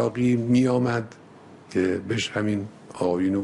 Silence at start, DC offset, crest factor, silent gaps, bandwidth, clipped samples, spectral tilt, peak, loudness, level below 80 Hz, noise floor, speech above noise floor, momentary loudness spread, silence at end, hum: 0 s; under 0.1%; 14 dB; none; 11 kHz; under 0.1%; -6.5 dB/octave; -10 dBFS; -24 LUFS; -60 dBFS; -47 dBFS; 24 dB; 10 LU; 0 s; none